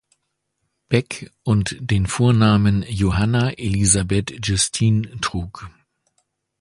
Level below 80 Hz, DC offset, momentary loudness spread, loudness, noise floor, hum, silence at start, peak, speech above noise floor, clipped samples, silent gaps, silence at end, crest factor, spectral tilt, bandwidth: -38 dBFS; under 0.1%; 10 LU; -19 LUFS; -74 dBFS; none; 0.9 s; 0 dBFS; 55 dB; under 0.1%; none; 0.9 s; 20 dB; -5 dB/octave; 11.5 kHz